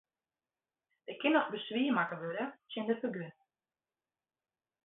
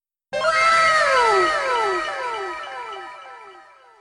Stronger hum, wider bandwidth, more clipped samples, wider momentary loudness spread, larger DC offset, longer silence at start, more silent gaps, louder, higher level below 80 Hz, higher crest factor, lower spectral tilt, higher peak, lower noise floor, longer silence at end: neither; second, 4 kHz vs 11 kHz; neither; second, 16 LU vs 19 LU; neither; first, 1.1 s vs 0.3 s; neither; second, -35 LUFS vs -18 LUFS; second, -88 dBFS vs -56 dBFS; about the same, 20 dB vs 16 dB; first, -3 dB/octave vs -1.5 dB/octave; second, -16 dBFS vs -4 dBFS; first, under -90 dBFS vs -47 dBFS; first, 1.55 s vs 0.4 s